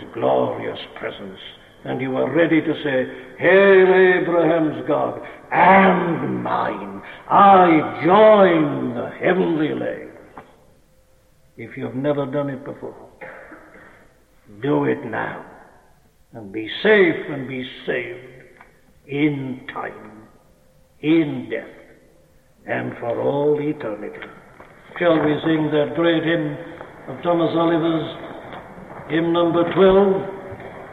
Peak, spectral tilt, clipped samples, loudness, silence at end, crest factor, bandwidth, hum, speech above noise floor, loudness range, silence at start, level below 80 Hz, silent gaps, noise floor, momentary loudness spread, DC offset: -4 dBFS; -8.5 dB/octave; under 0.1%; -18 LUFS; 0 s; 16 dB; 4.5 kHz; none; 36 dB; 12 LU; 0 s; -56 dBFS; none; -55 dBFS; 23 LU; under 0.1%